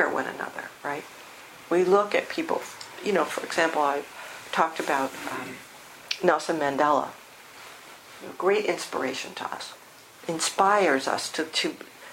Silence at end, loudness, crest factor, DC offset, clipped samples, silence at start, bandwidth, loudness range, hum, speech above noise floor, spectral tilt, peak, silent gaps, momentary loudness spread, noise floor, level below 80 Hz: 0 s; -26 LUFS; 22 dB; under 0.1%; under 0.1%; 0 s; 16.5 kHz; 2 LU; none; 21 dB; -3 dB/octave; -4 dBFS; none; 22 LU; -47 dBFS; -72 dBFS